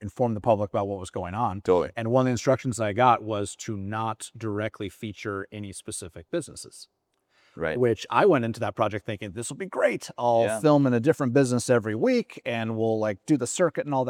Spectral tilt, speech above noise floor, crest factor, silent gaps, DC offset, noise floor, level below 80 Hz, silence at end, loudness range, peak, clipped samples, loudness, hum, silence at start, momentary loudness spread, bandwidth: -6 dB/octave; 41 dB; 20 dB; none; under 0.1%; -66 dBFS; -64 dBFS; 0 s; 9 LU; -4 dBFS; under 0.1%; -26 LUFS; none; 0 s; 13 LU; 16 kHz